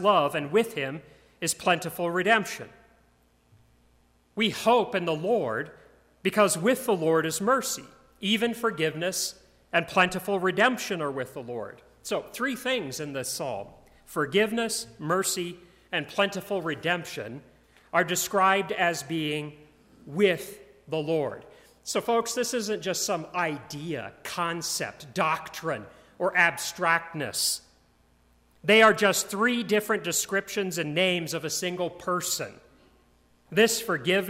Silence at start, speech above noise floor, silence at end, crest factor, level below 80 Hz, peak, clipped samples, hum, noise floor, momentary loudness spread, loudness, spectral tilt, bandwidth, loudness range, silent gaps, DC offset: 0 s; 37 dB; 0 s; 22 dB; -66 dBFS; -6 dBFS; under 0.1%; none; -64 dBFS; 12 LU; -27 LUFS; -3 dB/octave; 16 kHz; 5 LU; none; under 0.1%